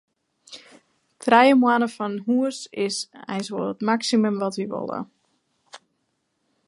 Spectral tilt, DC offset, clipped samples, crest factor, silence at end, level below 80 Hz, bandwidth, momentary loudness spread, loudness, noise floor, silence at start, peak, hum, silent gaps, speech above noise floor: -4.5 dB/octave; under 0.1%; under 0.1%; 22 dB; 0.9 s; -74 dBFS; 11.5 kHz; 21 LU; -22 LUFS; -73 dBFS; 0.5 s; -2 dBFS; none; none; 52 dB